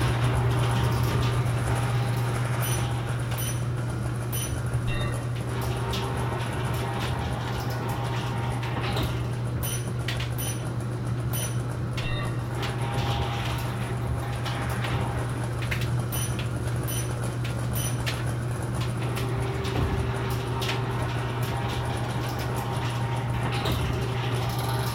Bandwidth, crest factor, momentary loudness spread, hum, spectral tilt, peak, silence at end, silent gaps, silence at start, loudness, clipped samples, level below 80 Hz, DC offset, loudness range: 16.5 kHz; 14 dB; 4 LU; none; -5.5 dB/octave; -14 dBFS; 0 s; none; 0 s; -28 LUFS; under 0.1%; -38 dBFS; under 0.1%; 2 LU